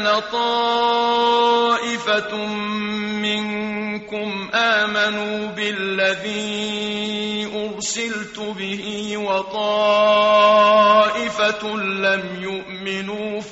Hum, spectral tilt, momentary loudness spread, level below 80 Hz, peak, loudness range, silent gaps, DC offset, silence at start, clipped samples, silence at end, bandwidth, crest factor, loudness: none; -1 dB/octave; 12 LU; -60 dBFS; -4 dBFS; 7 LU; none; under 0.1%; 0 s; under 0.1%; 0 s; 8 kHz; 16 dB; -19 LUFS